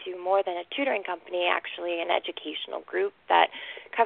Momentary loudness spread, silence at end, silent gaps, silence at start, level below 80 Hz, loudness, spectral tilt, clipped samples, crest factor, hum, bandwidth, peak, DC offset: 11 LU; 0 s; none; 0 s; -76 dBFS; -28 LUFS; -6 dB/octave; under 0.1%; 22 dB; none; 4.5 kHz; -6 dBFS; under 0.1%